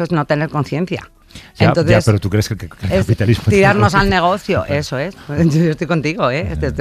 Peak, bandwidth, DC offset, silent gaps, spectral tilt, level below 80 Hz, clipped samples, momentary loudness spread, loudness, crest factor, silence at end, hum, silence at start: 0 dBFS; 14.5 kHz; under 0.1%; none; -6.5 dB/octave; -34 dBFS; under 0.1%; 10 LU; -15 LUFS; 14 dB; 0 s; none; 0 s